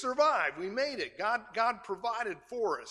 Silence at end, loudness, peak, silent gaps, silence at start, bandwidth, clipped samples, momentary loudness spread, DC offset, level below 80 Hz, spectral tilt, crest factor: 0 s; -32 LUFS; -14 dBFS; none; 0 s; 11.5 kHz; under 0.1%; 8 LU; under 0.1%; -72 dBFS; -3 dB/octave; 18 dB